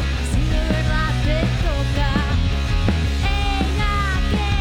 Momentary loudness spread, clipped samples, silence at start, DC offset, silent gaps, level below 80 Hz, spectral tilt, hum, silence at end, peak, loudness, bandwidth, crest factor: 1 LU; under 0.1%; 0 s; under 0.1%; none; -22 dBFS; -5.5 dB/octave; none; 0 s; -6 dBFS; -21 LUFS; 13.5 kHz; 12 dB